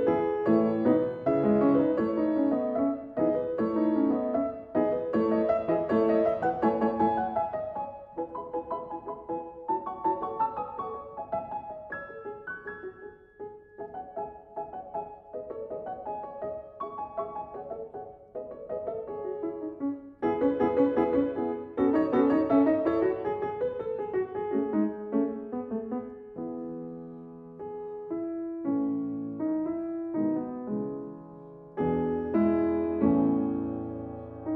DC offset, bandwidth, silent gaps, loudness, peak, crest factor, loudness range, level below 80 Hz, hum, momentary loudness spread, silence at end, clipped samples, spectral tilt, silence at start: under 0.1%; 4.9 kHz; none; -29 LUFS; -12 dBFS; 18 dB; 12 LU; -60 dBFS; none; 16 LU; 0 s; under 0.1%; -10.5 dB/octave; 0 s